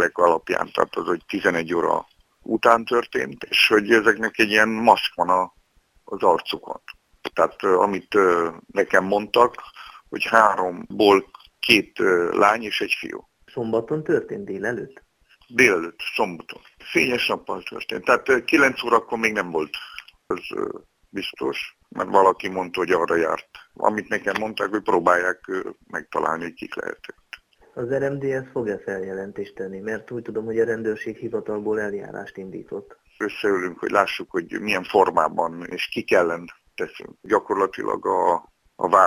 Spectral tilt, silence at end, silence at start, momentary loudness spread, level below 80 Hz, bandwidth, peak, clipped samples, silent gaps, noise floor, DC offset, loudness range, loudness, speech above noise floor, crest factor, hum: -4 dB/octave; 0 s; 0 s; 16 LU; -60 dBFS; 19.5 kHz; 0 dBFS; under 0.1%; none; -60 dBFS; under 0.1%; 8 LU; -22 LUFS; 38 dB; 22 dB; none